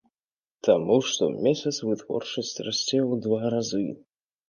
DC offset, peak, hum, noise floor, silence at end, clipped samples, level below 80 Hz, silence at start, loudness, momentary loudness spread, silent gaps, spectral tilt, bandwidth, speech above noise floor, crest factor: under 0.1%; -6 dBFS; none; under -90 dBFS; 0.55 s; under 0.1%; -68 dBFS; 0.65 s; -26 LUFS; 8 LU; none; -4.5 dB/octave; 10 kHz; over 65 dB; 20 dB